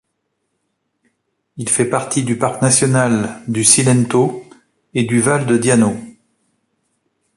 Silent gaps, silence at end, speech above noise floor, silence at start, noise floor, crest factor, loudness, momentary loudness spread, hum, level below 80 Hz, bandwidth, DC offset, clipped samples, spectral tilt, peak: none; 1.25 s; 57 dB; 1.55 s; -71 dBFS; 18 dB; -15 LUFS; 10 LU; none; -54 dBFS; 11.5 kHz; under 0.1%; under 0.1%; -4.5 dB/octave; 0 dBFS